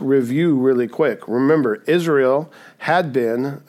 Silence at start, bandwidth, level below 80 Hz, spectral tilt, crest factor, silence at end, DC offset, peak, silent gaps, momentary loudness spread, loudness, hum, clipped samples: 0 s; 15 kHz; -74 dBFS; -7 dB/octave; 14 dB; 0.1 s; under 0.1%; -4 dBFS; none; 5 LU; -18 LUFS; none; under 0.1%